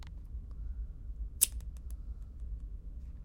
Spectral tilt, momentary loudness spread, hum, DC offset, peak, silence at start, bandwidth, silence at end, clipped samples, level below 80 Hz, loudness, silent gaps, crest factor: -1.5 dB/octave; 18 LU; none; under 0.1%; -6 dBFS; 0 s; 16.5 kHz; 0 s; under 0.1%; -42 dBFS; -38 LUFS; none; 32 dB